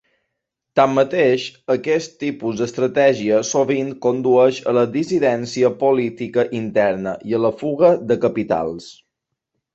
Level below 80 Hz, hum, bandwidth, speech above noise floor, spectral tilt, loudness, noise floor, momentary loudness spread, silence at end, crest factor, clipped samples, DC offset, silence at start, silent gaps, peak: -60 dBFS; none; 8 kHz; 61 dB; -5.5 dB/octave; -18 LUFS; -79 dBFS; 7 LU; 0.8 s; 16 dB; under 0.1%; under 0.1%; 0.75 s; none; -2 dBFS